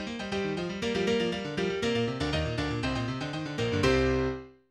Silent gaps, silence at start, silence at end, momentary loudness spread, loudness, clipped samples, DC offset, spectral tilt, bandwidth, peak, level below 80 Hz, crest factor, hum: none; 0 s; 0.2 s; 8 LU; -30 LUFS; under 0.1%; under 0.1%; -5.5 dB/octave; 12.5 kHz; -10 dBFS; -44 dBFS; 18 dB; none